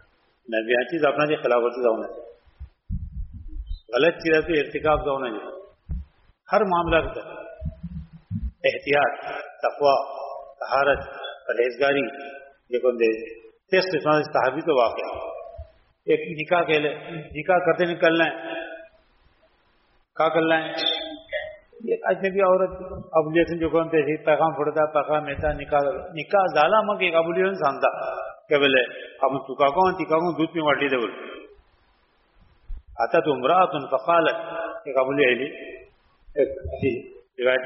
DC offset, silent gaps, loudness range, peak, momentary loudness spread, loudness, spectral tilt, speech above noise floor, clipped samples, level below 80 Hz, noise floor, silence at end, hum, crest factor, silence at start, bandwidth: under 0.1%; none; 4 LU; -4 dBFS; 17 LU; -23 LUFS; -3 dB/octave; 41 dB; under 0.1%; -44 dBFS; -63 dBFS; 0 s; none; 20 dB; 0.5 s; 6 kHz